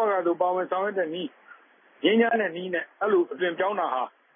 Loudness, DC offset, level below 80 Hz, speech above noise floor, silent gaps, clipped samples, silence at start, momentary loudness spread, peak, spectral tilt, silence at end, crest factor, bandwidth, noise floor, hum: -26 LUFS; under 0.1%; -88 dBFS; 29 dB; none; under 0.1%; 0 s; 9 LU; -10 dBFS; -9 dB/octave; 0.25 s; 16 dB; 3.7 kHz; -54 dBFS; none